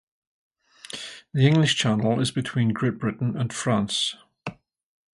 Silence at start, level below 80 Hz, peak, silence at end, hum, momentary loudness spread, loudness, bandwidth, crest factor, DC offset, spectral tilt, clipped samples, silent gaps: 0.95 s; -60 dBFS; -6 dBFS; 0.6 s; none; 18 LU; -23 LUFS; 11.5 kHz; 20 dB; under 0.1%; -5 dB/octave; under 0.1%; none